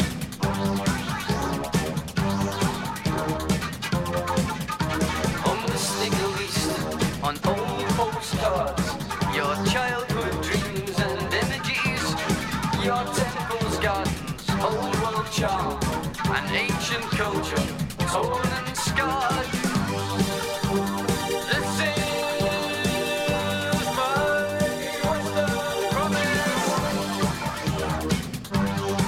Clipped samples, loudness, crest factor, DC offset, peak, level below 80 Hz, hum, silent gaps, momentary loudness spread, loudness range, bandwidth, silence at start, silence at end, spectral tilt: under 0.1%; -25 LUFS; 16 dB; under 0.1%; -8 dBFS; -42 dBFS; none; none; 4 LU; 2 LU; 16.5 kHz; 0 s; 0 s; -4.5 dB/octave